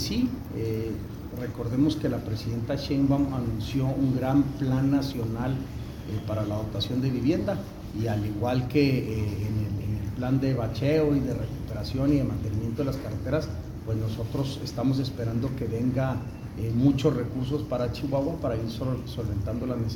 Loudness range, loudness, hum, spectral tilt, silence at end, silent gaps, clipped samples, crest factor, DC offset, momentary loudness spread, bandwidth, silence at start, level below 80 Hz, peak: 3 LU; -28 LUFS; none; -7.5 dB/octave; 0 s; none; under 0.1%; 18 dB; under 0.1%; 9 LU; 17.5 kHz; 0 s; -42 dBFS; -10 dBFS